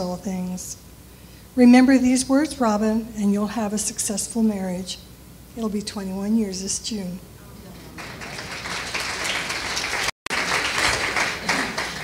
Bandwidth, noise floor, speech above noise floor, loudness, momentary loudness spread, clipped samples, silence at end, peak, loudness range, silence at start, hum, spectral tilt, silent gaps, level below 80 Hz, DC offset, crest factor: 16 kHz; -44 dBFS; 23 dB; -22 LUFS; 17 LU; under 0.1%; 0 s; -2 dBFS; 9 LU; 0 s; none; -3.5 dB/octave; 10.12-10.26 s; -48 dBFS; under 0.1%; 20 dB